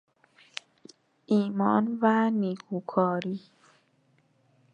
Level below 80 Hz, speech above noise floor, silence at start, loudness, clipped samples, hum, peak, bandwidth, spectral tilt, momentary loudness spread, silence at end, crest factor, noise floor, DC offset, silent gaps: -80 dBFS; 41 dB; 1.3 s; -27 LUFS; under 0.1%; none; -8 dBFS; 8.6 kHz; -7.5 dB/octave; 18 LU; 1.35 s; 20 dB; -67 dBFS; under 0.1%; none